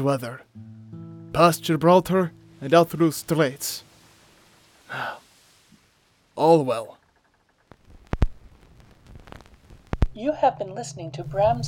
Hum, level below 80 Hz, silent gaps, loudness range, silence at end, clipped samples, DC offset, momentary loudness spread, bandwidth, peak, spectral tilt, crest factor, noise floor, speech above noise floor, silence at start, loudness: none; -38 dBFS; none; 11 LU; 0 s; under 0.1%; under 0.1%; 23 LU; 19.5 kHz; -4 dBFS; -6 dB/octave; 22 dB; -64 dBFS; 43 dB; 0 s; -23 LUFS